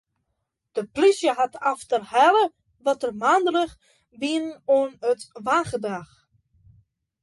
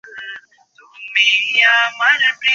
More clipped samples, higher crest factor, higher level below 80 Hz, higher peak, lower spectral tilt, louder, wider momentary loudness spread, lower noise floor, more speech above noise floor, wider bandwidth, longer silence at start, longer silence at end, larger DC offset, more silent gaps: neither; about the same, 18 dB vs 16 dB; first, -64 dBFS vs -74 dBFS; second, -6 dBFS vs 0 dBFS; first, -4 dB/octave vs 2 dB/octave; second, -23 LUFS vs -13 LUFS; second, 12 LU vs 20 LU; first, -78 dBFS vs -50 dBFS; first, 56 dB vs 36 dB; first, 11.5 kHz vs 7.6 kHz; first, 0.75 s vs 0.05 s; first, 1.2 s vs 0 s; neither; neither